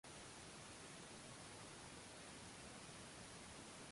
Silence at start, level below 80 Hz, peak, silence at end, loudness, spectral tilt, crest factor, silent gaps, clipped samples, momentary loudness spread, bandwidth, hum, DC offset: 0.05 s; -74 dBFS; -44 dBFS; 0 s; -56 LUFS; -3 dB/octave; 14 dB; none; under 0.1%; 0 LU; 11.5 kHz; none; under 0.1%